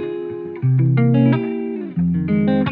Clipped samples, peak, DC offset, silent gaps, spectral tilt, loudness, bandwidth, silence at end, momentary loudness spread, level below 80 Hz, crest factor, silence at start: under 0.1%; -4 dBFS; under 0.1%; none; -12 dB/octave; -18 LUFS; 4.2 kHz; 0 s; 11 LU; -50 dBFS; 14 dB; 0 s